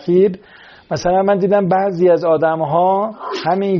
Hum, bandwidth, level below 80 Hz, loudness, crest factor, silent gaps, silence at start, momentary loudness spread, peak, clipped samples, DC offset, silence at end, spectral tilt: none; 7 kHz; -50 dBFS; -15 LUFS; 12 dB; none; 0 s; 8 LU; -4 dBFS; under 0.1%; under 0.1%; 0 s; -6 dB/octave